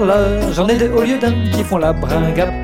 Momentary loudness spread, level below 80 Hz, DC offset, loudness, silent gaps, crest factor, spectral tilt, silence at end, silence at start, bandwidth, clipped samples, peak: 3 LU; -26 dBFS; under 0.1%; -15 LUFS; none; 12 dB; -6.5 dB/octave; 0 s; 0 s; 17 kHz; under 0.1%; -2 dBFS